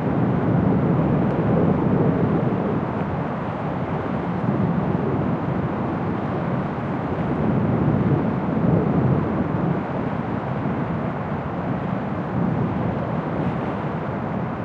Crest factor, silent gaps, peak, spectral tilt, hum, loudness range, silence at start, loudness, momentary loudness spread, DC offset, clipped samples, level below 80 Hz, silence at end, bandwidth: 16 dB; none; -6 dBFS; -10.5 dB/octave; none; 4 LU; 0 s; -23 LUFS; 6 LU; under 0.1%; under 0.1%; -44 dBFS; 0 s; 5.4 kHz